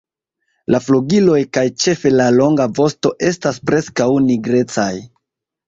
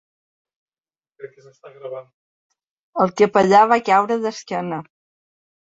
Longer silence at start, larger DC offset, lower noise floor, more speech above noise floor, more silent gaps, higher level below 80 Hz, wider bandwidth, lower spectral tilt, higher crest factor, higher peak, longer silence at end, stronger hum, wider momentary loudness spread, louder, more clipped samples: second, 0.7 s vs 1.2 s; neither; second, -78 dBFS vs under -90 dBFS; second, 64 dB vs over 72 dB; second, none vs 2.14-2.50 s, 2.67-2.93 s; first, -52 dBFS vs -66 dBFS; about the same, 7.8 kHz vs 8 kHz; about the same, -5.5 dB/octave vs -5.5 dB/octave; second, 14 dB vs 20 dB; about the same, -2 dBFS vs -2 dBFS; second, 0.6 s vs 0.8 s; neither; second, 7 LU vs 21 LU; about the same, -15 LUFS vs -17 LUFS; neither